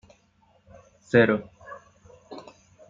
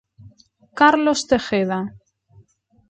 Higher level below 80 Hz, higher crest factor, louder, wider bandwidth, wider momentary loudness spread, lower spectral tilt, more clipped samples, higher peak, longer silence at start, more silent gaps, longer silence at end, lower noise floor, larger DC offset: second, -64 dBFS vs -54 dBFS; about the same, 24 dB vs 20 dB; second, -22 LUFS vs -18 LUFS; second, 7.6 kHz vs 9.2 kHz; first, 25 LU vs 16 LU; first, -7 dB/octave vs -4.5 dB/octave; neither; second, -6 dBFS vs -2 dBFS; first, 1.15 s vs 0.25 s; neither; second, 0.5 s vs 0.9 s; first, -63 dBFS vs -56 dBFS; neither